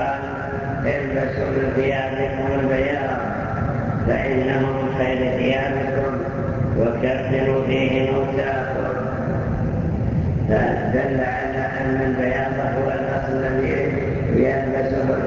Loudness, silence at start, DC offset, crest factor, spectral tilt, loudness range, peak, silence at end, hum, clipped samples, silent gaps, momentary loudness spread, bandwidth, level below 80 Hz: -21 LUFS; 0 s; under 0.1%; 16 dB; -8.5 dB/octave; 1 LU; -6 dBFS; 0 s; none; under 0.1%; none; 4 LU; 7.2 kHz; -36 dBFS